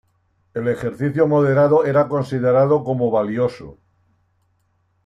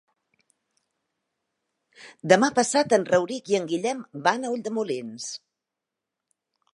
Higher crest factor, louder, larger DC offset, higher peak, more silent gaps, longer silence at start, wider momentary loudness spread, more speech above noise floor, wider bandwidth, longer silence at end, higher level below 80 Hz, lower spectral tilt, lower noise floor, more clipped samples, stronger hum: second, 16 dB vs 24 dB; first, -18 LUFS vs -24 LUFS; neither; about the same, -4 dBFS vs -2 dBFS; neither; second, 0.55 s vs 2 s; second, 9 LU vs 15 LU; second, 47 dB vs 62 dB; about the same, 10.5 kHz vs 11.5 kHz; about the same, 1.3 s vs 1.4 s; first, -56 dBFS vs -74 dBFS; first, -9 dB/octave vs -4 dB/octave; second, -65 dBFS vs -86 dBFS; neither; neither